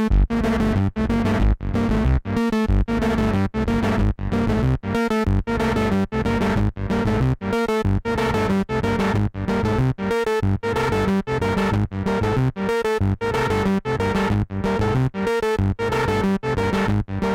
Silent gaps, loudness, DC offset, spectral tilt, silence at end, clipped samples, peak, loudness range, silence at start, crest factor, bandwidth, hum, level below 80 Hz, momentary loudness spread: none; -21 LUFS; under 0.1%; -7.5 dB/octave; 0 s; under 0.1%; -8 dBFS; 1 LU; 0 s; 12 dB; 15.5 kHz; none; -28 dBFS; 2 LU